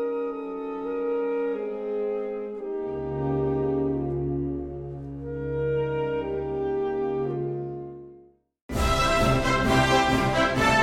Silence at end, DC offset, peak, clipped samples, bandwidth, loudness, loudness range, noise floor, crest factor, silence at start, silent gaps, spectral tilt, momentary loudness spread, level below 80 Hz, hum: 0 s; under 0.1%; -8 dBFS; under 0.1%; 16 kHz; -26 LUFS; 5 LU; -54 dBFS; 18 dB; 0 s; 8.62-8.69 s; -5.5 dB/octave; 12 LU; -38 dBFS; none